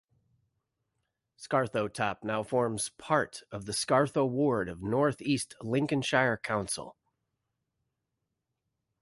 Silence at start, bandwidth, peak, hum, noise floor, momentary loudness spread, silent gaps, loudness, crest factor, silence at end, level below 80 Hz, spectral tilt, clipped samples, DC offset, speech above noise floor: 1.4 s; 12 kHz; -10 dBFS; none; -84 dBFS; 9 LU; none; -30 LUFS; 22 dB; 2.1 s; -64 dBFS; -4.5 dB/octave; under 0.1%; under 0.1%; 54 dB